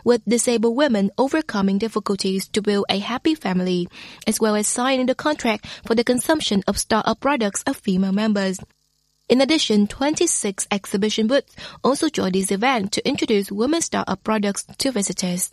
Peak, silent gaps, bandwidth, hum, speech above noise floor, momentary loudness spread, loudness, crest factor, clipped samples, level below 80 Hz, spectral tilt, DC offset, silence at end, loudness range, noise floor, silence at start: -2 dBFS; none; 14 kHz; none; 46 dB; 5 LU; -21 LUFS; 18 dB; under 0.1%; -52 dBFS; -4 dB/octave; under 0.1%; 0.05 s; 1 LU; -66 dBFS; 0.05 s